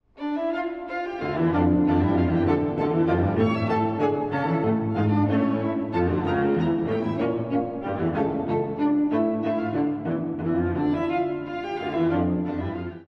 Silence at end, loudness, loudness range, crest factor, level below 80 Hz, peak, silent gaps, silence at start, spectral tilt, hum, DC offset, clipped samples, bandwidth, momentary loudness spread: 0.05 s; -24 LUFS; 3 LU; 16 dB; -48 dBFS; -8 dBFS; none; 0.15 s; -9.5 dB/octave; none; under 0.1%; under 0.1%; 6 kHz; 7 LU